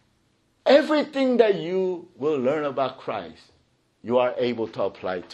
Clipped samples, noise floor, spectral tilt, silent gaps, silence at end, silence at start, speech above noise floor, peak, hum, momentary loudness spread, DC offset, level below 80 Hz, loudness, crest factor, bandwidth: under 0.1%; -66 dBFS; -6 dB/octave; none; 0 s; 0.65 s; 43 dB; -4 dBFS; none; 13 LU; under 0.1%; -70 dBFS; -24 LUFS; 20 dB; 8.8 kHz